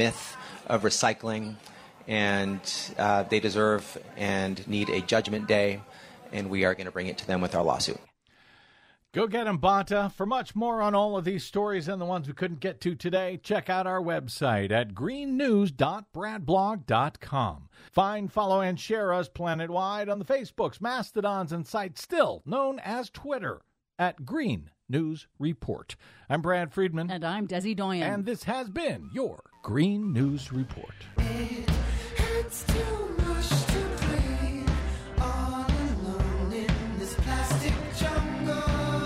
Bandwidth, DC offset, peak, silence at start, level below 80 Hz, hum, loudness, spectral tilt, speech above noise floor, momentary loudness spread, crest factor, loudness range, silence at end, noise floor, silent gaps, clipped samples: 16 kHz; under 0.1%; -8 dBFS; 0 s; -38 dBFS; none; -29 LUFS; -5.5 dB/octave; 33 dB; 9 LU; 20 dB; 3 LU; 0 s; -61 dBFS; none; under 0.1%